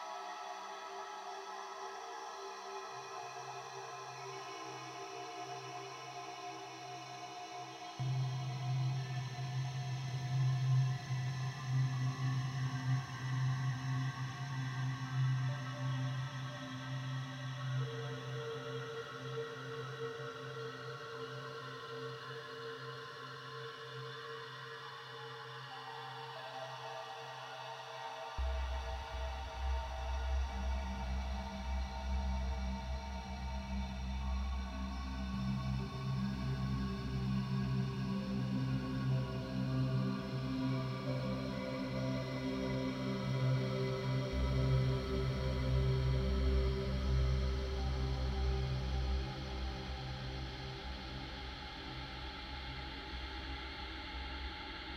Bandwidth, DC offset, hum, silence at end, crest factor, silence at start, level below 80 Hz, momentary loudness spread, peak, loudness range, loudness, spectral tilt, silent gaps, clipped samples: 8.8 kHz; under 0.1%; none; 0 s; 16 dB; 0 s; -44 dBFS; 11 LU; -22 dBFS; 10 LU; -40 LUFS; -6.5 dB/octave; none; under 0.1%